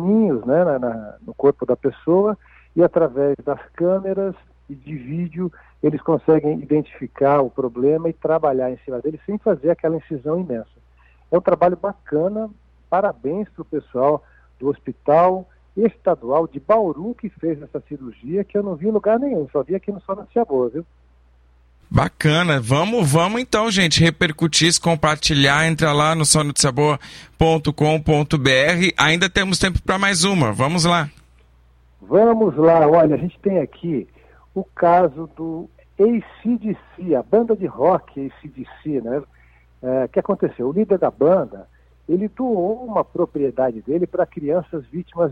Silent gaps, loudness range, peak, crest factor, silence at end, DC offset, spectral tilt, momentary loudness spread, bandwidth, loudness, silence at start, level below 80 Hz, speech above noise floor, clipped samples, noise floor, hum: none; 6 LU; 0 dBFS; 18 dB; 0 s; under 0.1%; -5 dB/octave; 14 LU; 15.5 kHz; -19 LUFS; 0 s; -44 dBFS; 34 dB; under 0.1%; -53 dBFS; none